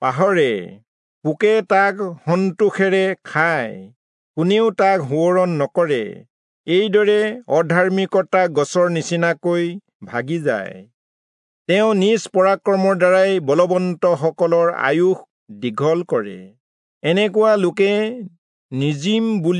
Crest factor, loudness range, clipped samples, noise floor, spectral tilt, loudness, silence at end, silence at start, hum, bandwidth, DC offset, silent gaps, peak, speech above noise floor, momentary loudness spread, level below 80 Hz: 14 dB; 3 LU; under 0.1%; under -90 dBFS; -6 dB/octave; -18 LUFS; 0 s; 0 s; none; 10.5 kHz; under 0.1%; 0.88-1.22 s, 3.96-4.34 s, 6.30-6.64 s, 9.95-10.00 s, 10.94-11.65 s, 15.30-15.46 s, 16.60-17.01 s, 18.38-18.69 s; -2 dBFS; over 73 dB; 11 LU; -74 dBFS